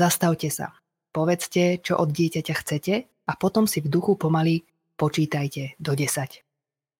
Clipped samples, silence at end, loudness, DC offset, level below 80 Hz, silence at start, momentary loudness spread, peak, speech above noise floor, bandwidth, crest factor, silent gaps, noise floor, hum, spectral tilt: under 0.1%; 0.65 s; -24 LUFS; under 0.1%; -64 dBFS; 0 s; 9 LU; -6 dBFS; 63 dB; 17 kHz; 18 dB; none; -87 dBFS; none; -5.5 dB/octave